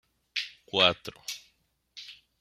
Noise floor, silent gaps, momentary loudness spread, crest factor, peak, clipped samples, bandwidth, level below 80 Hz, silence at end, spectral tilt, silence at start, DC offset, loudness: -71 dBFS; none; 23 LU; 28 dB; -6 dBFS; under 0.1%; 16 kHz; -68 dBFS; 0.25 s; -2.5 dB/octave; 0.35 s; under 0.1%; -28 LUFS